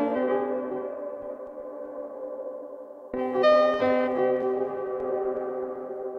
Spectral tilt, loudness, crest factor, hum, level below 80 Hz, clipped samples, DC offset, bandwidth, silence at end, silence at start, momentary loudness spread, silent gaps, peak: -6.5 dB/octave; -27 LUFS; 18 dB; none; -66 dBFS; under 0.1%; under 0.1%; 6.6 kHz; 0 s; 0 s; 17 LU; none; -10 dBFS